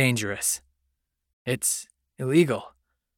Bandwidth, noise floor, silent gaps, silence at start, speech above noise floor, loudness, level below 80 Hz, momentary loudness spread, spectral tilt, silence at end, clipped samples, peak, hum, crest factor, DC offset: 19 kHz; -77 dBFS; 1.33-1.45 s; 0 s; 53 dB; -25 LUFS; -66 dBFS; 11 LU; -4 dB/octave; 0.5 s; under 0.1%; -6 dBFS; none; 20 dB; under 0.1%